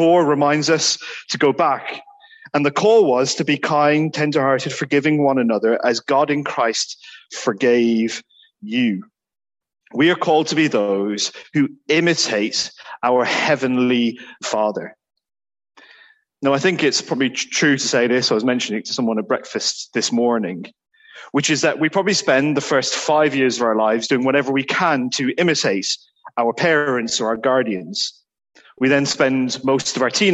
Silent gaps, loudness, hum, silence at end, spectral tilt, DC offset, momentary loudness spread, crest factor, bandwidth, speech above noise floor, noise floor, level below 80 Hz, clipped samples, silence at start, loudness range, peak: none; -18 LUFS; none; 0 s; -4 dB/octave; under 0.1%; 8 LU; 16 dB; 8.6 kHz; 33 dB; -51 dBFS; -66 dBFS; under 0.1%; 0 s; 4 LU; -4 dBFS